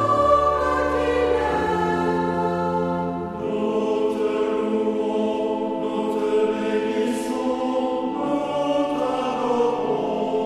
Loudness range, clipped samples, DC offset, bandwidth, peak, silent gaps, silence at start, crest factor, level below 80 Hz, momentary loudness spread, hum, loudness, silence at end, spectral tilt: 2 LU; under 0.1%; under 0.1%; 13 kHz; -4 dBFS; none; 0 s; 16 dB; -46 dBFS; 4 LU; none; -22 LUFS; 0 s; -6.5 dB/octave